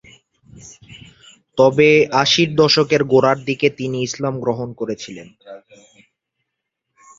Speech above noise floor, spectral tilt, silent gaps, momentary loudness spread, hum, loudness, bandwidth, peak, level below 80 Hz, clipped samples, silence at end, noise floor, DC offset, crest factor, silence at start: 61 dB; -4.5 dB/octave; none; 14 LU; none; -16 LUFS; 7.8 kHz; 0 dBFS; -56 dBFS; under 0.1%; 1.6 s; -78 dBFS; under 0.1%; 18 dB; 0.55 s